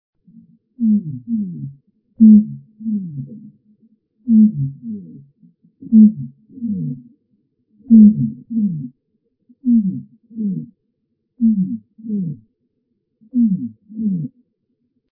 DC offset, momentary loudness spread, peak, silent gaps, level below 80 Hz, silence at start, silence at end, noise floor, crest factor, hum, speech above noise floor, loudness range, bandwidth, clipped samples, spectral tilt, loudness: under 0.1%; 22 LU; 0 dBFS; none; -62 dBFS; 0.8 s; 0.9 s; -71 dBFS; 18 dB; none; 55 dB; 8 LU; 0.6 kHz; under 0.1%; -17 dB/octave; -16 LUFS